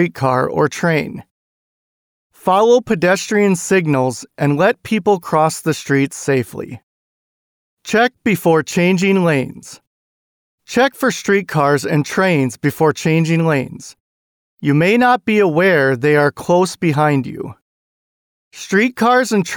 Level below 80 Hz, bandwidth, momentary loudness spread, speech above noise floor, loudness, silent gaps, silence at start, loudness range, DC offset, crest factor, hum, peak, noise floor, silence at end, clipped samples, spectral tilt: -56 dBFS; over 20 kHz; 9 LU; over 75 dB; -15 LUFS; 1.31-2.30 s, 6.83-7.77 s, 9.87-10.58 s, 14.00-14.58 s, 17.62-18.51 s; 0 s; 3 LU; under 0.1%; 14 dB; none; -2 dBFS; under -90 dBFS; 0 s; under 0.1%; -5.5 dB/octave